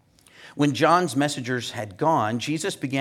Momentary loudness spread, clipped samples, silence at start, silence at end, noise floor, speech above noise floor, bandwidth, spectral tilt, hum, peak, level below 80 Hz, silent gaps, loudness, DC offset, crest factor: 9 LU; under 0.1%; 0.4 s; 0 s; -50 dBFS; 27 dB; 15.5 kHz; -5 dB/octave; none; -4 dBFS; -70 dBFS; none; -23 LUFS; under 0.1%; 20 dB